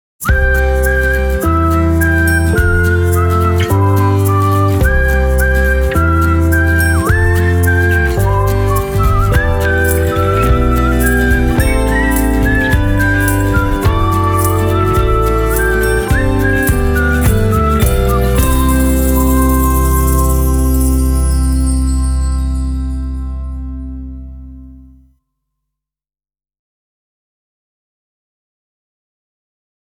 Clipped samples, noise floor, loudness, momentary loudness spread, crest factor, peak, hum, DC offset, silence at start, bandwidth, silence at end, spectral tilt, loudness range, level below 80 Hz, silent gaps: under 0.1%; under -90 dBFS; -13 LUFS; 4 LU; 12 dB; 0 dBFS; 50 Hz at -35 dBFS; under 0.1%; 0.2 s; over 20 kHz; 5.25 s; -6 dB/octave; 6 LU; -16 dBFS; none